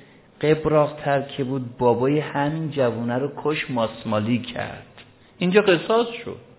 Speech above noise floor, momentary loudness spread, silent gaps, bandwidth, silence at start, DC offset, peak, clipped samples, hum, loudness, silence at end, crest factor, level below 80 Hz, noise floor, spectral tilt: 27 dB; 9 LU; none; 4 kHz; 0.4 s; under 0.1%; -4 dBFS; under 0.1%; none; -22 LUFS; 0.2 s; 18 dB; -56 dBFS; -49 dBFS; -10.5 dB/octave